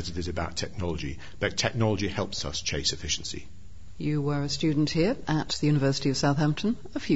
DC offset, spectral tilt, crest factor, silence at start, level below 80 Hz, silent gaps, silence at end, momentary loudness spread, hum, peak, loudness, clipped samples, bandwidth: 1%; -5 dB/octave; 18 dB; 0 s; -46 dBFS; none; 0 s; 8 LU; none; -8 dBFS; -28 LUFS; under 0.1%; 8 kHz